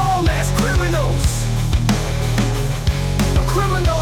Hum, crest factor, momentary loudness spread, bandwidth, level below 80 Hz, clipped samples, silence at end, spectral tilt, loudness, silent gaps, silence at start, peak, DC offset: none; 12 dB; 3 LU; 18.5 kHz; -22 dBFS; under 0.1%; 0 s; -5.5 dB/octave; -18 LUFS; none; 0 s; -6 dBFS; under 0.1%